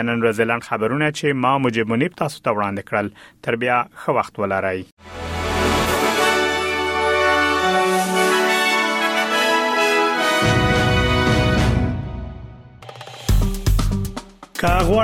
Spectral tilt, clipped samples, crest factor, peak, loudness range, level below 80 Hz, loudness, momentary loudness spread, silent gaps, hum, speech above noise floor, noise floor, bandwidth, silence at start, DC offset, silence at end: -4.5 dB/octave; under 0.1%; 16 dB; -4 dBFS; 6 LU; -30 dBFS; -19 LUFS; 12 LU; 4.92-4.97 s; none; 19 dB; -39 dBFS; 16.5 kHz; 0 s; under 0.1%; 0 s